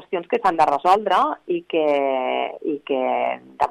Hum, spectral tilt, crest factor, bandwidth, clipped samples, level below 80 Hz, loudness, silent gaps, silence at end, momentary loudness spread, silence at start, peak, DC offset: none; -5 dB/octave; 16 dB; 12.5 kHz; under 0.1%; -60 dBFS; -21 LUFS; none; 0 s; 9 LU; 0 s; -4 dBFS; under 0.1%